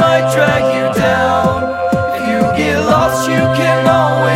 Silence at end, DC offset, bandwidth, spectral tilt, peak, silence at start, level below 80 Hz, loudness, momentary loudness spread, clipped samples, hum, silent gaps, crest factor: 0 s; under 0.1%; 16.5 kHz; -5.5 dB/octave; 0 dBFS; 0 s; -38 dBFS; -13 LUFS; 4 LU; under 0.1%; none; none; 12 dB